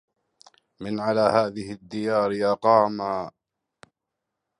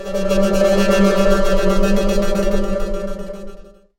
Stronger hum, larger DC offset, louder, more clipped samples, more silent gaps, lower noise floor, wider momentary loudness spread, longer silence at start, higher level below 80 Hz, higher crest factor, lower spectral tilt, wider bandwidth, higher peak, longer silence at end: neither; neither; second, -23 LUFS vs -17 LUFS; neither; neither; first, -84 dBFS vs -36 dBFS; about the same, 15 LU vs 13 LU; first, 0.8 s vs 0 s; second, -64 dBFS vs -22 dBFS; first, 22 dB vs 14 dB; about the same, -6.5 dB/octave vs -5.5 dB/octave; second, 11 kHz vs 16.5 kHz; about the same, -4 dBFS vs -2 dBFS; first, 1.3 s vs 0.35 s